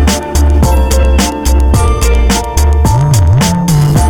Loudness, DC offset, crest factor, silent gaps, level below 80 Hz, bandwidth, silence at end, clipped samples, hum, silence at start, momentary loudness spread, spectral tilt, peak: -10 LUFS; under 0.1%; 8 dB; none; -10 dBFS; 18 kHz; 0 s; under 0.1%; none; 0 s; 3 LU; -5.5 dB/octave; 0 dBFS